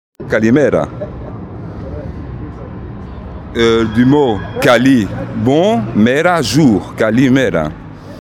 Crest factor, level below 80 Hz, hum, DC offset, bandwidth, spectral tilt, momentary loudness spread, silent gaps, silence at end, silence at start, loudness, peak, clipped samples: 14 dB; -34 dBFS; none; under 0.1%; 16 kHz; -6 dB/octave; 18 LU; none; 0 s; 0.2 s; -12 LUFS; 0 dBFS; under 0.1%